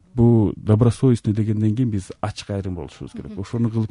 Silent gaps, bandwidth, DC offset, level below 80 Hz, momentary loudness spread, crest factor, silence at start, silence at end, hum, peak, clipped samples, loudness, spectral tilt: none; 11 kHz; under 0.1%; -44 dBFS; 16 LU; 14 dB; 0.15 s; 0.05 s; none; -6 dBFS; under 0.1%; -20 LUFS; -8.5 dB/octave